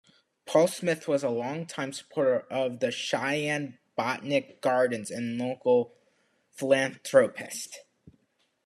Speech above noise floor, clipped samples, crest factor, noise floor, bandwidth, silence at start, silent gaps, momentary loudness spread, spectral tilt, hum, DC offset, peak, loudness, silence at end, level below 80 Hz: 45 dB; under 0.1%; 22 dB; -72 dBFS; 13 kHz; 0.45 s; none; 12 LU; -4.5 dB/octave; none; under 0.1%; -6 dBFS; -28 LUFS; 0.85 s; -78 dBFS